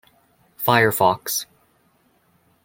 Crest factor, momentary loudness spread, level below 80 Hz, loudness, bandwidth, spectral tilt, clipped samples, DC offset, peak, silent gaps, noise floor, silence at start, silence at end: 22 dB; 10 LU; -62 dBFS; -19 LUFS; 17 kHz; -3.5 dB/octave; under 0.1%; under 0.1%; -2 dBFS; none; -62 dBFS; 0.6 s; 1.2 s